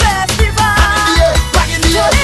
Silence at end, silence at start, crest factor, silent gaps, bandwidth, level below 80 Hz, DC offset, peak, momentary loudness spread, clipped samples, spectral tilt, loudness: 0 s; 0 s; 10 dB; none; 13 kHz; -16 dBFS; under 0.1%; 0 dBFS; 3 LU; under 0.1%; -3.5 dB/octave; -11 LUFS